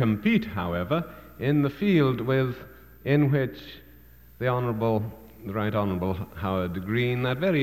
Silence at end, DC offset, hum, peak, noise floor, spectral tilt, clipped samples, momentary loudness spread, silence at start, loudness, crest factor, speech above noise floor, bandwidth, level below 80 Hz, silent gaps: 0 s; 0.1%; none; -10 dBFS; -52 dBFS; -8.5 dB/octave; under 0.1%; 12 LU; 0 s; -26 LUFS; 16 dB; 27 dB; 15 kHz; -52 dBFS; none